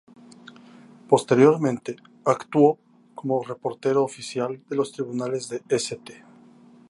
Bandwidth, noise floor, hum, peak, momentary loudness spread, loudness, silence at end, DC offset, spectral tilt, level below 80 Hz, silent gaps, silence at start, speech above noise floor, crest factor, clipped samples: 11.5 kHz; -51 dBFS; none; -2 dBFS; 14 LU; -23 LUFS; 0.75 s; under 0.1%; -6 dB/octave; -72 dBFS; none; 1.1 s; 29 dB; 22 dB; under 0.1%